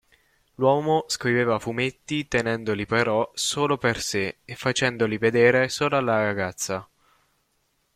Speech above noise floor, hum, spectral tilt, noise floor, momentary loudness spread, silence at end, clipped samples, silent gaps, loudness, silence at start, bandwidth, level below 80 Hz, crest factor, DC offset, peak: 47 dB; none; -4 dB/octave; -70 dBFS; 8 LU; 1.1 s; under 0.1%; none; -23 LUFS; 0.6 s; 15.5 kHz; -56 dBFS; 20 dB; under 0.1%; -4 dBFS